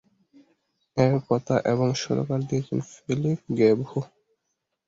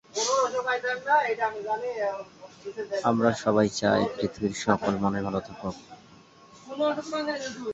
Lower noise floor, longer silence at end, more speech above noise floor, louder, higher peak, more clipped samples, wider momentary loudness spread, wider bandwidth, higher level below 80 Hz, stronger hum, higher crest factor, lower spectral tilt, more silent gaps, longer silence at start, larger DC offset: first, -79 dBFS vs -53 dBFS; first, 0.8 s vs 0 s; first, 55 dB vs 26 dB; about the same, -25 LUFS vs -27 LUFS; about the same, -6 dBFS vs -6 dBFS; neither; second, 10 LU vs 13 LU; about the same, 7.8 kHz vs 8 kHz; about the same, -60 dBFS vs -58 dBFS; neither; about the same, 20 dB vs 22 dB; first, -7 dB/octave vs -4.5 dB/octave; neither; first, 0.95 s vs 0.15 s; neither